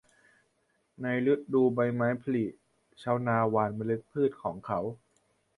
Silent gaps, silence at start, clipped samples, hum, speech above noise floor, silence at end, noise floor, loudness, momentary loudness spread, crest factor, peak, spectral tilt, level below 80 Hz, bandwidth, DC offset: none; 1 s; under 0.1%; none; 45 dB; 0.65 s; -74 dBFS; -30 LUFS; 10 LU; 18 dB; -12 dBFS; -9 dB/octave; -66 dBFS; 11 kHz; under 0.1%